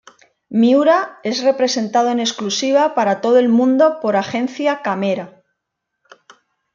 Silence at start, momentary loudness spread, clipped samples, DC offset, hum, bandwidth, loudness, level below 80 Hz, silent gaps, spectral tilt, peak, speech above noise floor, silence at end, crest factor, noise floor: 0.5 s; 9 LU; under 0.1%; under 0.1%; none; 7.4 kHz; -16 LUFS; -68 dBFS; none; -4.5 dB/octave; -2 dBFS; 62 dB; 1.45 s; 14 dB; -77 dBFS